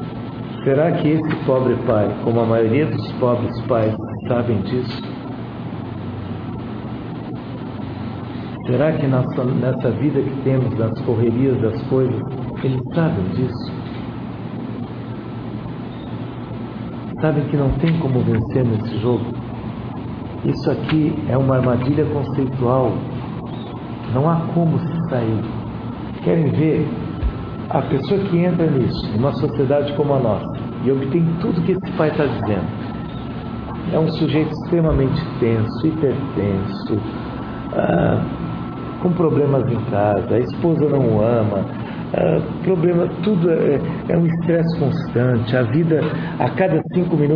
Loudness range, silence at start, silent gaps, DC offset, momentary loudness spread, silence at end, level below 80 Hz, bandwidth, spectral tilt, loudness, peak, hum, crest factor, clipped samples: 6 LU; 0 s; none; under 0.1%; 12 LU; 0 s; -40 dBFS; 5.4 kHz; -10.5 dB/octave; -20 LUFS; -2 dBFS; none; 16 dB; under 0.1%